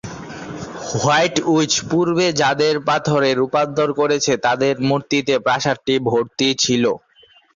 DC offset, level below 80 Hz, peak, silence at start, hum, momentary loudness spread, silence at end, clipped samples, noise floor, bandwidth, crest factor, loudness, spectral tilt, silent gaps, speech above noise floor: under 0.1%; -54 dBFS; -4 dBFS; 0.05 s; none; 10 LU; 0.6 s; under 0.1%; -52 dBFS; 7.8 kHz; 14 dB; -17 LUFS; -4 dB/octave; none; 35 dB